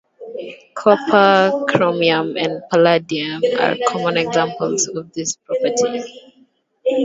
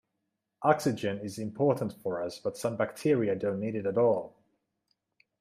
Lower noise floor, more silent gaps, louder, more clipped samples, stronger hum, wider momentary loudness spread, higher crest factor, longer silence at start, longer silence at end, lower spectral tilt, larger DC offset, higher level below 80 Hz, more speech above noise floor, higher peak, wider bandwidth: second, -56 dBFS vs -83 dBFS; neither; first, -17 LUFS vs -30 LUFS; neither; neither; first, 14 LU vs 8 LU; about the same, 18 dB vs 22 dB; second, 0.2 s vs 0.6 s; second, 0 s vs 1.1 s; second, -3.5 dB/octave vs -6.5 dB/octave; neither; first, -64 dBFS vs -72 dBFS; second, 39 dB vs 54 dB; first, 0 dBFS vs -8 dBFS; second, 7.8 kHz vs 15.5 kHz